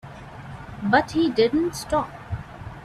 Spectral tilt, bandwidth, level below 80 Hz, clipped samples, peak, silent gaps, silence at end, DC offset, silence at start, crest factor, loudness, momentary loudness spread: -5.5 dB/octave; 14 kHz; -46 dBFS; under 0.1%; -4 dBFS; none; 0 s; under 0.1%; 0.05 s; 20 dB; -23 LUFS; 19 LU